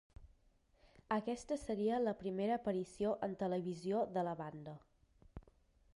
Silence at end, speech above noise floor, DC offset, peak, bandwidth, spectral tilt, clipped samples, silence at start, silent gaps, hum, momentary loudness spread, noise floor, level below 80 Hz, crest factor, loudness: 0.55 s; 33 dB; under 0.1%; -24 dBFS; 11.5 kHz; -7 dB/octave; under 0.1%; 0.2 s; none; none; 19 LU; -72 dBFS; -66 dBFS; 16 dB; -40 LUFS